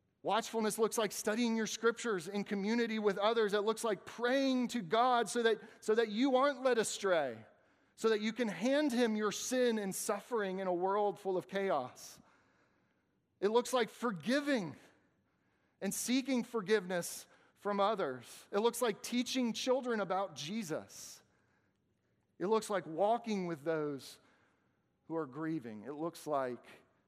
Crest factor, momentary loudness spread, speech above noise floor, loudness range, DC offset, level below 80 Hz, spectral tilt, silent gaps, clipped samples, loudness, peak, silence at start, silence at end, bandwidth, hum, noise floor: 18 dB; 10 LU; 43 dB; 6 LU; under 0.1%; -86 dBFS; -4 dB/octave; none; under 0.1%; -35 LUFS; -18 dBFS; 0.25 s; 0.3 s; 15.5 kHz; none; -78 dBFS